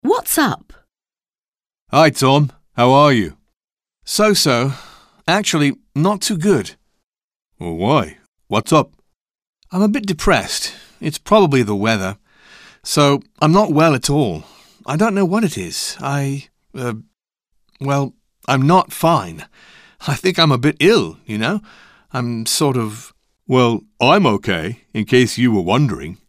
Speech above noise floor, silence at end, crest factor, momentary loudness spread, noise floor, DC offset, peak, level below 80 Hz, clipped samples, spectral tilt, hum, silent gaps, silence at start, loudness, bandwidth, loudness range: over 74 dB; 0.15 s; 16 dB; 14 LU; under -90 dBFS; under 0.1%; -2 dBFS; -42 dBFS; under 0.1%; -5 dB/octave; none; 1.48-1.52 s, 1.81-1.86 s, 7.06-7.10 s, 7.24-7.28 s, 7.36-7.40 s, 8.28-8.33 s, 9.16-9.25 s, 9.47-9.53 s; 0.05 s; -16 LUFS; 15.5 kHz; 4 LU